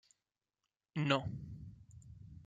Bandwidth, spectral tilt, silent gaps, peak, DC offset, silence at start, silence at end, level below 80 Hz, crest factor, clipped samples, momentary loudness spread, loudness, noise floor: 8.6 kHz; -6 dB/octave; none; -16 dBFS; under 0.1%; 0.95 s; 0 s; -64 dBFS; 26 dB; under 0.1%; 23 LU; -38 LUFS; under -90 dBFS